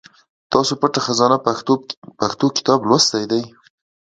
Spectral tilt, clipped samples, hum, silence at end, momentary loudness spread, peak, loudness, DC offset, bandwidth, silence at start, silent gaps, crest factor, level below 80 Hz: -4 dB/octave; under 0.1%; none; 0.65 s; 9 LU; 0 dBFS; -17 LUFS; under 0.1%; 9.2 kHz; 0.5 s; 1.97-2.02 s; 18 dB; -60 dBFS